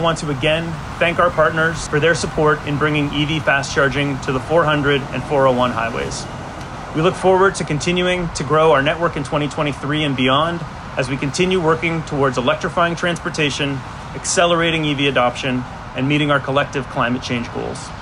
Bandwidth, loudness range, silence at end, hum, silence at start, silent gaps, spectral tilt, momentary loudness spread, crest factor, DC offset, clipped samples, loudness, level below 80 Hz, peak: 11.5 kHz; 2 LU; 0 s; none; 0 s; none; -4.5 dB/octave; 9 LU; 14 dB; under 0.1%; under 0.1%; -18 LUFS; -38 dBFS; -4 dBFS